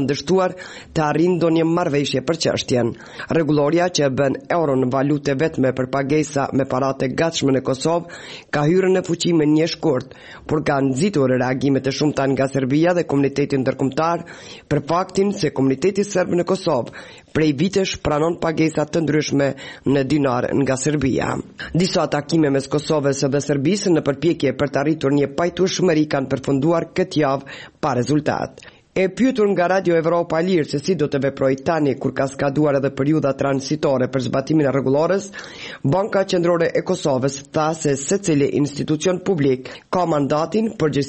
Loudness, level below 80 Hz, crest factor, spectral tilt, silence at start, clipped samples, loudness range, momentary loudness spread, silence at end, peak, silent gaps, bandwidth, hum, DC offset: -19 LUFS; -50 dBFS; 12 dB; -6 dB/octave; 0 s; under 0.1%; 1 LU; 5 LU; 0 s; -6 dBFS; none; 8.8 kHz; none; under 0.1%